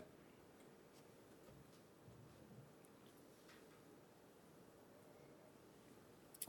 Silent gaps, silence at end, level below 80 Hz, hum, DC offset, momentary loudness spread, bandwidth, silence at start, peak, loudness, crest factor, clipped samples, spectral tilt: none; 0 s; -86 dBFS; none; under 0.1%; 2 LU; 19 kHz; 0 s; -32 dBFS; -65 LUFS; 32 dB; under 0.1%; -4 dB/octave